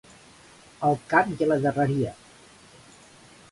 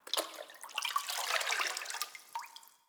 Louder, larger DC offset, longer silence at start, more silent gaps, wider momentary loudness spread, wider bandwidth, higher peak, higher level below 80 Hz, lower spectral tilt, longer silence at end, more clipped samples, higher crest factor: first, -24 LUFS vs -36 LUFS; neither; first, 0.8 s vs 0.05 s; neither; second, 6 LU vs 13 LU; second, 11.5 kHz vs over 20 kHz; first, -4 dBFS vs -16 dBFS; first, -60 dBFS vs under -90 dBFS; first, -7 dB/octave vs 3.5 dB/octave; first, 1.4 s vs 0.2 s; neither; about the same, 22 dB vs 24 dB